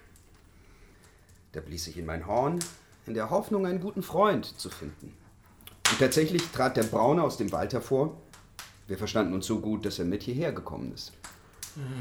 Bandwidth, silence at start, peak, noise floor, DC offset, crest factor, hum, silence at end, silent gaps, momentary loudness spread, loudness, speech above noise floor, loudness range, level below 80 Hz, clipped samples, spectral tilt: over 20 kHz; 0.8 s; -4 dBFS; -57 dBFS; under 0.1%; 26 dB; none; 0 s; none; 20 LU; -29 LUFS; 28 dB; 6 LU; -54 dBFS; under 0.1%; -4.5 dB/octave